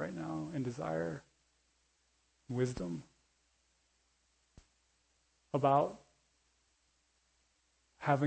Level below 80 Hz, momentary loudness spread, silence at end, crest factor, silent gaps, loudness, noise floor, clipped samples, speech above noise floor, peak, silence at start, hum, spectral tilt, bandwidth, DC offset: -68 dBFS; 13 LU; 0 s; 24 dB; none; -37 LUFS; -76 dBFS; under 0.1%; 42 dB; -16 dBFS; 0 s; none; -7.5 dB/octave; 8.4 kHz; under 0.1%